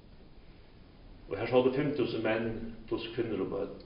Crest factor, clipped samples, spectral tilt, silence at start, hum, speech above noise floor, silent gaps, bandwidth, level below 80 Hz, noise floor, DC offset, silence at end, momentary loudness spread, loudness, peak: 20 dB; under 0.1%; -5 dB/octave; 0.05 s; none; 22 dB; none; 5.2 kHz; -54 dBFS; -54 dBFS; under 0.1%; 0 s; 11 LU; -32 LUFS; -14 dBFS